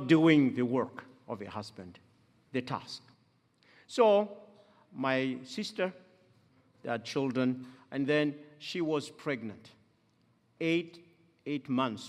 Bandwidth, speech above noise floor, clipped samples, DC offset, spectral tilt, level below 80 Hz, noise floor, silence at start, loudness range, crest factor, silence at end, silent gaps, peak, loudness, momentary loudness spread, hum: 11.5 kHz; 39 dB; under 0.1%; under 0.1%; -6 dB/octave; -78 dBFS; -70 dBFS; 0 s; 4 LU; 22 dB; 0 s; none; -10 dBFS; -32 LUFS; 21 LU; none